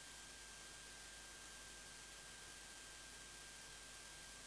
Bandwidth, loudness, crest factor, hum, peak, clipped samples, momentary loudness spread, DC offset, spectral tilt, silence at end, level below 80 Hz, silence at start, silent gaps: 11 kHz; -54 LUFS; 14 dB; none; -42 dBFS; under 0.1%; 0 LU; under 0.1%; -0.5 dB/octave; 0 s; -70 dBFS; 0 s; none